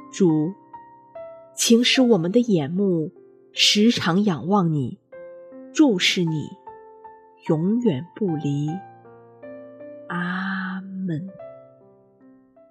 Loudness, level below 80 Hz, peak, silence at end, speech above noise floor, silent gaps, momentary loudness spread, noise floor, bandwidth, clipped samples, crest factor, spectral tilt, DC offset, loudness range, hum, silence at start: -21 LUFS; -70 dBFS; -4 dBFS; 1.1 s; 33 dB; none; 24 LU; -53 dBFS; 13.5 kHz; under 0.1%; 18 dB; -4.5 dB/octave; under 0.1%; 12 LU; none; 0 s